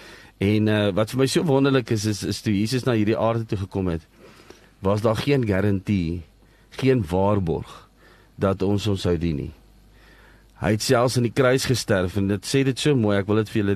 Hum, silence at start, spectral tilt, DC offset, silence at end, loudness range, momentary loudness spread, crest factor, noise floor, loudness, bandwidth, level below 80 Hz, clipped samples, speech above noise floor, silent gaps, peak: none; 0 s; -6 dB/octave; under 0.1%; 0 s; 4 LU; 8 LU; 16 dB; -53 dBFS; -22 LUFS; 13 kHz; -46 dBFS; under 0.1%; 31 dB; none; -6 dBFS